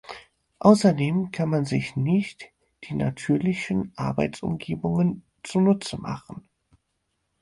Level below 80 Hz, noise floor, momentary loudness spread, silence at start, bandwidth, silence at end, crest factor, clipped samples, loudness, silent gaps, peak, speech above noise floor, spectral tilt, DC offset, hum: -54 dBFS; -76 dBFS; 17 LU; 0.1 s; 11.5 kHz; 1 s; 20 dB; under 0.1%; -24 LUFS; none; -4 dBFS; 52 dB; -7 dB/octave; under 0.1%; none